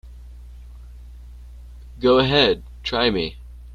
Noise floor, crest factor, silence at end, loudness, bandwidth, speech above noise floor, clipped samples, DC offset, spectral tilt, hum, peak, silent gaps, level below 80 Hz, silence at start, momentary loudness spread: -40 dBFS; 20 dB; 0 s; -19 LUFS; 7.4 kHz; 21 dB; under 0.1%; under 0.1%; -6 dB/octave; 60 Hz at -40 dBFS; -4 dBFS; none; -38 dBFS; 0.05 s; 12 LU